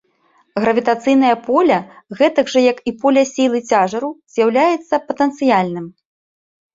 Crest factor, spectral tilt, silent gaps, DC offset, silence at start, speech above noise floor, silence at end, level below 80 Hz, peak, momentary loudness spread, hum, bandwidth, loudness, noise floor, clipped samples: 14 dB; -5 dB/octave; none; under 0.1%; 0.55 s; 43 dB; 0.85 s; -62 dBFS; -2 dBFS; 9 LU; none; 7.8 kHz; -16 LUFS; -58 dBFS; under 0.1%